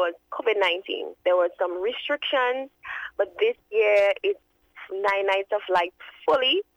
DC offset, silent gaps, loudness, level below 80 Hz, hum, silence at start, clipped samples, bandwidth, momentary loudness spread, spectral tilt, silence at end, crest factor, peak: under 0.1%; none; -24 LUFS; -68 dBFS; none; 0 s; under 0.1%; 10.5 kHz; 11 LU; -3 dB/octave; 0.15 s; 14 dB; -10 dBFS